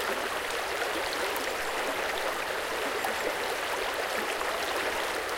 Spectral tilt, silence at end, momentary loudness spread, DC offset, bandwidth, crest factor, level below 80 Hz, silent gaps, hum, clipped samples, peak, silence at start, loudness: -1.5 dB/octave; 0 s; 1 LU; under 0.1%; 17 kHz; 16 dB; -58 dBFS; none; none; under 0.1%; -14 dBFS; 0 s; -30 LUFS